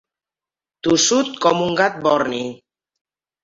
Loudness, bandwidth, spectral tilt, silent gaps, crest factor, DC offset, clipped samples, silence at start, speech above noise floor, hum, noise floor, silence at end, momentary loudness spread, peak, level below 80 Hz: -18 LUFS; 8 kHz; -3 dB/octave; none; 18 dB; under 0.1%; under 0.1%; 0.85 s; over 72 dB; none; under -90 dBFS; 0.85 s; 11 LU; -2 dBFS; -58 dBFS